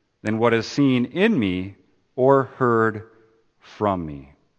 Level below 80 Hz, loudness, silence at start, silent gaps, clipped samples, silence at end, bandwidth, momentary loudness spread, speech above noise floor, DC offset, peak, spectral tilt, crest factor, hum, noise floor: -56 dBFS; -21 LUFS; 0.25 s; none; under 0.1%; 0.35 s; 8.6 kHz; 17 LU; 37 dB; under 0.1%; -2 dBFS; -7 dB/octave; 20 dB; none; -58 dBFS